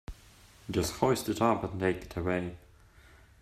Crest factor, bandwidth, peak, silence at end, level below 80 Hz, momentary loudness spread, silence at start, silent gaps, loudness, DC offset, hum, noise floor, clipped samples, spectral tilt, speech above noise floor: 22 dB; 16 kHz; -10 dBFS; 0.85 s; -52 dBFS; 12 LU; 0.1 s; none; -31 LUFS; under 0.1%; none; -57 dBFS; under 0.1%; -5.5 dB/octave; 27 dB